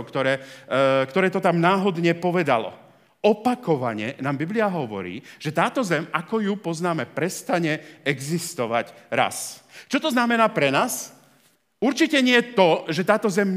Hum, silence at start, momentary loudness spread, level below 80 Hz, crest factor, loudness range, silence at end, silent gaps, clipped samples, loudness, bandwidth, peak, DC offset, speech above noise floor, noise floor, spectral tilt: none; 0 s; 9 LU; -76 dBFS; 20 dB; 5 LU; 0 s; none; under 0.1%; -22 LUFS; 16 kHz; -2 dBFS; under 0.1%; 39 dB; -61 dBFS; -5 dB/octave